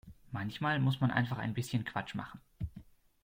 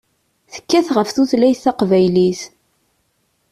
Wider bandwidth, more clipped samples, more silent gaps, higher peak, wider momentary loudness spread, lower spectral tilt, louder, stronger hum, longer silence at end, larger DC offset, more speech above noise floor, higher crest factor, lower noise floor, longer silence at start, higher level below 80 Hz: first, 16 kHz vs 13.5 kHz; neither; neither; second, -14 dBFS vs -4 dBFS; second, 14 LU vs 20 LU; about the same, -6.5 dB/octave vs -6 dB/octave; second, -35 LUFS vs -15 LUFS; neither; second, 0.4 s vs 1.05 s; neither; second, 22 dB vs 51 dB; first, 20 dB vs 14 dB; second, -56 dBFS vs -65 dBFS; second, 0.05 s vs 0.55 s; about the same, -58 dBFS vs -56 dBFS